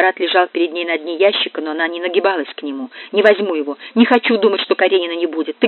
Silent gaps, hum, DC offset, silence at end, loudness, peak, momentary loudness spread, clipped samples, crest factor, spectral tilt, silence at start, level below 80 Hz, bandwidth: none; none; under 0.1%; 0 s; -16 LUFS; 0 dBFS; 9 LU; under 0.1%; 16 dB; -1 dB/octave; 0 s; -82 dBFS; 4.3 kHz